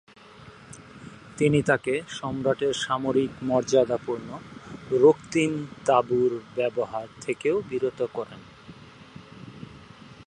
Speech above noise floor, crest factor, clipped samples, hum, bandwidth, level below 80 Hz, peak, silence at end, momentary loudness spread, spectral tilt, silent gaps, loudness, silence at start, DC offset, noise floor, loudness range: 23 dB; 20 dB; under 0.1%; none; 11 kHz; -60 dBFS; -6 dBFS; 0.05 s; 23 LU; -5.5 dB/octave; none; -25 LUFS; 0.4 s; under 0.1%; -48 dBFS; 6 LU